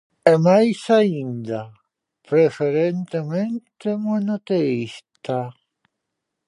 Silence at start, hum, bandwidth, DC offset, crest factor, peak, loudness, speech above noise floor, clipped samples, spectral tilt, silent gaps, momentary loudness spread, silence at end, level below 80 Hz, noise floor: 0.25 s; none; 11 kHz; under 0.1%; 20 dB; 0 dBFS; -20 LUFS; 61 dB; under 0.1%; -7.5 dB/octave; none; 14 LU; 0.95 s; -70 dBFS; -80 dBFS